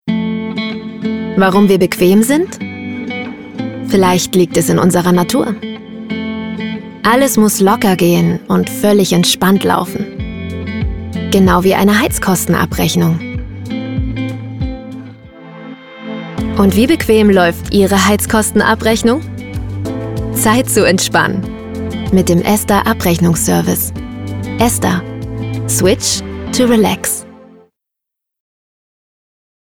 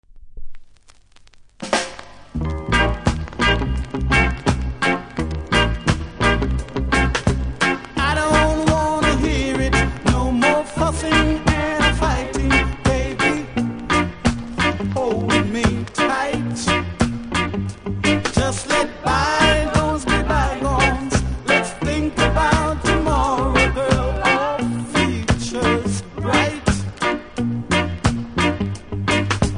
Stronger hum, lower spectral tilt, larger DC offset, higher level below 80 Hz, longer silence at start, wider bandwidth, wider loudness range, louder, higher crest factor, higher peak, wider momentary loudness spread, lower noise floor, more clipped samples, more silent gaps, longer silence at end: neither; about the same, -5 dB/octave vs -5 dB/octave; neither; about the same, -32 dBFS vs -28 dBFS; about the same, 0.05 s vs 0.15 s; first, 19 kHz vs 10.5 kHz; about the same, 5 LU vs 3 LU; first, -13 LUFS vs -19 LUFS; about the same, 14 dB vs 18 dB; about the same, 0 dBFS vs -2 dBFS; first, 13 LU vs 6 LU; first, -80 dBFS vs -47 dBFS; neither; neither; first, 2.35 s vs 0 s